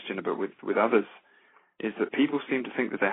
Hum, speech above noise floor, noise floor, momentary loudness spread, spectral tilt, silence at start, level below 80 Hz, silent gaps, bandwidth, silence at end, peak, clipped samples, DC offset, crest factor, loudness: none; 34 dB; -61 dBFS; 10 LU; -3.5 dB/octave; 0 s; -78 dBFS; none; 4 kHz; 0 s; -8 dBFS; under 0.1%; under 0.1%; 20 dB; -28 LUFS